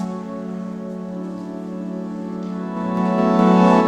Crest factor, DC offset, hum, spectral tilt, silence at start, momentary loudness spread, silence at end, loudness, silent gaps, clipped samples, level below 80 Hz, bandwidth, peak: 18 dB; under 0.1%; none; -8 dB/octave; 0 s; 15 LU; 0 s; -22 LUFS; none; under 0.1%; -56 dBFS; 8.6 kHz; -2 dBFS